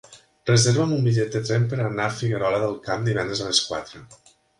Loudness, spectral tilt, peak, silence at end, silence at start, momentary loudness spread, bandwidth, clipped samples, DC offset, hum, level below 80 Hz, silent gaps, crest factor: -23 LUFS; -4.5 dB/octave; -4 dBFS; 0.45 s; 0.1 s; 8 LU; 11.5 kHz; under 0.1%; under 0.1%; none; -56 dBFS; none; 20 dB